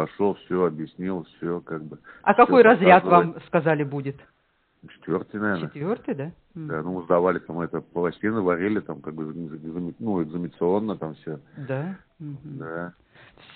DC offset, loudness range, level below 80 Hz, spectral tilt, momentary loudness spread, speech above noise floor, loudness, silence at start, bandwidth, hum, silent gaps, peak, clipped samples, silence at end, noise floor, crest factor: under 0.1%; 10 LU; -62 dBFS; -5.5 dB/octave; 21 LU; 44 dB; -23 LUFS; 0 s; 4.5 kHz; none; none; 0 dBFS; under 0.1%; 0.65 s; -67 dBFS; 22 dB